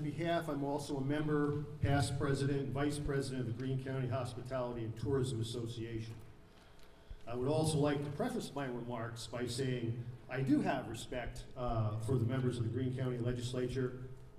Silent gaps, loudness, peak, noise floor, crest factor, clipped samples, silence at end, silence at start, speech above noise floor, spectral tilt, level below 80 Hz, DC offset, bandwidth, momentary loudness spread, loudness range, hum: none; -38 LUFS; -20 dBFS; -57 dBFS; 16 dB; under 0.1%; 0 s; 0 s; 21 dB; -6.5 dB/octave; -54 dBFS; under 0.1%; 14.5 kHz; 9 LU; 4 LU; none